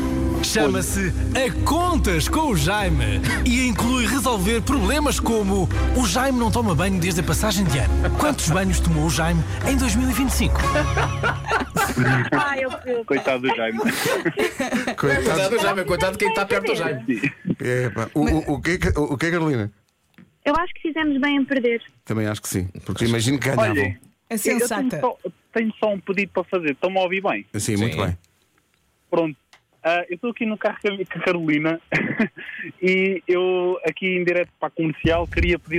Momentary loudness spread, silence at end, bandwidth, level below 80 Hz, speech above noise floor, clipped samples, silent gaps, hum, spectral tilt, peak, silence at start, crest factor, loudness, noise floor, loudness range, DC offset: 6 LU; 0 s; 16 kHz; -30 dBFS; 43 dB; under 0.1%; none; none; -5 dB/octave; -10 dBFS; 0 s; 12 dB; -21 LUFS; -64 dBFS; 4 LU; under 0.1%